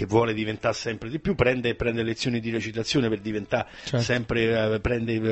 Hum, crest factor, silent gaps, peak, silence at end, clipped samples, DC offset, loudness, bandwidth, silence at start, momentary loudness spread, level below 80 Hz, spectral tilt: none; 18 dB; none; -6 dBFS; 0 s; under 0.1%; under 0.1%; -26 LUFS; 8.4 kHz; 0 s; 6 LU; -44 dBFS; -5.5 dB/octave